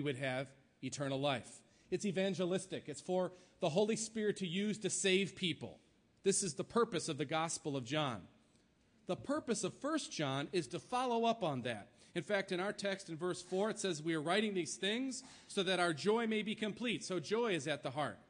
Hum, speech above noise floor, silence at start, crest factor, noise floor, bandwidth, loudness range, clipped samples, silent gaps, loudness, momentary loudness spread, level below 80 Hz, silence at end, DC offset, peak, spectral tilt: none; 34 dB; 0 s; 18 dB; -71 dBFS; 10.5 kHz; 3 LU; under 0.1%; none; -38 LUFS; 9 LU; -78 dBFS; 0.1 s; under 0.1%; -20 dBFS; -4 dB/octave